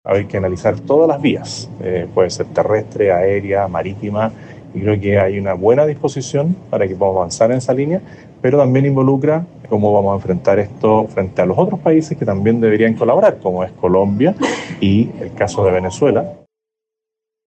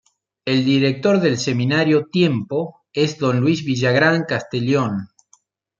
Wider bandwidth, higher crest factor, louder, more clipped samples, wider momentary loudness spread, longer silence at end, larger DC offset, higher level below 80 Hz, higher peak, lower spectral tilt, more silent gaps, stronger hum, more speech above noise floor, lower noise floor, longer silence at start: first, 8.8 kHz vs 7.4 kHz; about the same, 14 dB vs 16 dB; first, -16 LUFS vs -19 LUFS; neither; about the same, 8 LU vs 9 LU; first, 1.25 s vs 0.75 s; neither; first, -52 dBFS vs -60 dBFS; about the same, 0 dBFS vs -2 dBFS; about the same, -7 dB/octave vs -6 dB/octave; neither; neither; first, 68 dB vs 41 dB; first, -83 dBFS vs -59 dBFS; second, 0.05 s vs 0.45 s